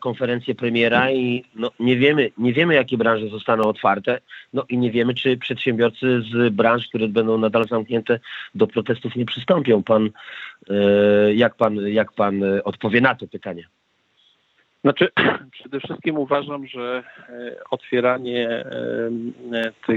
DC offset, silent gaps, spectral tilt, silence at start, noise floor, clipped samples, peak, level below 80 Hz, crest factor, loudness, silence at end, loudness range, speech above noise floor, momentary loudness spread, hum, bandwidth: under 0.1%; none; -8 dB/octave; 0 s; -63 dBFS; under 0.1%; -2 dBFS; -66 dBFS; 18 dB; -20 LUFS; 0 s; 5 LU; 43 dB; 13 LU; none; 7 kHz